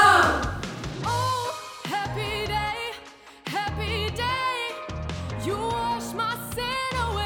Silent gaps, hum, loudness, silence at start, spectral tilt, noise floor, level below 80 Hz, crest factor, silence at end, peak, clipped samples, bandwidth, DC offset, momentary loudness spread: none; none; -27 LUFS; 0 s; -4 dB/octave; -46 dBFS; -42 dBFS; 22 dB; 0 s; -4 dBFS; under 0.1%; 19 kHz; under 0.1%; 8 LU